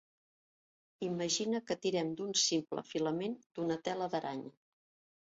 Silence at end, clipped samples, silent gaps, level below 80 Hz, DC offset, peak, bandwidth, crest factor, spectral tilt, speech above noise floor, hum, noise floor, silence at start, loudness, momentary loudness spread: 0.7 s; under 0.1%; 3.46-3.50 s; -78 dBFS; under 0.1%; -18 dBFS; 7.6 kHz; 20 dB; -3.5 dB/octave; over 54 dB; none; under -90 dBFS; 1 s; -36 LUFS; 10 LU